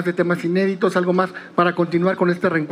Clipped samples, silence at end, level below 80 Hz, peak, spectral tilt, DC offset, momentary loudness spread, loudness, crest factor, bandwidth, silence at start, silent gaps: under 0.1%; 0 s; -72 dBFS; -2 dBFS; -7.5 dB/octave; under 0.1%; 2 LU; -19 LUFS; 18 dB; 11.5 kHz; 0 s; none